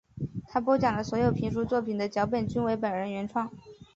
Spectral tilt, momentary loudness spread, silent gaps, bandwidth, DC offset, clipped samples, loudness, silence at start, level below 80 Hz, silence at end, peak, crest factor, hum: -7.5 dB/octave; 8 LU; none; 7.8 kHz; under 0.1%; under 0.1%; -29 LUFS; 0.15 s; -54 dBFS; 0.1 s; -12 dBFS; 18 dB; none